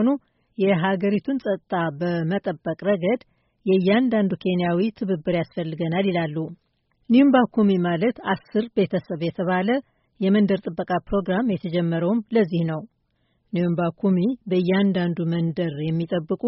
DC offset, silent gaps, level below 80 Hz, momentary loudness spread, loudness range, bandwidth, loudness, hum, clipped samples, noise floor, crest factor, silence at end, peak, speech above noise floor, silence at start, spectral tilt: under 0.1%; none; -56 dBFS; 7 LU; 3 LU; 5.8 kHz; -23 LUFS; none; under 0.1%; -69 dBFS; 16 dB; 0 s; -6 dBFS; 47 dB; 0 s; -6.5 dB/octave